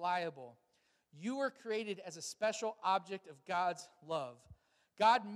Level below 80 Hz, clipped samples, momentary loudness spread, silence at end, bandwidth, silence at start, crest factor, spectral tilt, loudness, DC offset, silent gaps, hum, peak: -80 dBFS; under 0.1%; 15 LU; 0 s; 14 kHz; 0 s; 22 dB; -3.5 dB/octave; -38 LUFS; under 0.1%; none; none; -18 dBFS